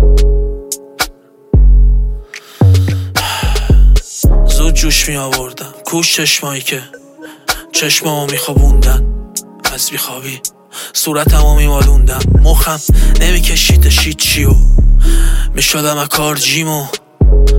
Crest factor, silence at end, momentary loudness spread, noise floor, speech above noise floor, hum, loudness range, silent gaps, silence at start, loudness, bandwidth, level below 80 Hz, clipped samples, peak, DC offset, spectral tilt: 10 dB; 0 s; 10 LU; -30 dBFS; 21 dB; none; 4 LU; none; 0 s; -12 LUFS; 17 kHz; -10 dBFS; under 0.1%; 0 dBFS; under 0.1%; -3.5 dB/octave